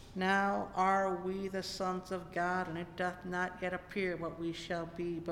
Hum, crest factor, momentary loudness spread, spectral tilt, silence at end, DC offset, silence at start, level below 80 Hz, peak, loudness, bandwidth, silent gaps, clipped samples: none; 18 dB; 9 LU; -5.5 dB/octave; 0 s; under 0.1%; 0 s; -60 dBFS; -18 dBFS; -36 LUFS; 16 kHz; none; under 0.1%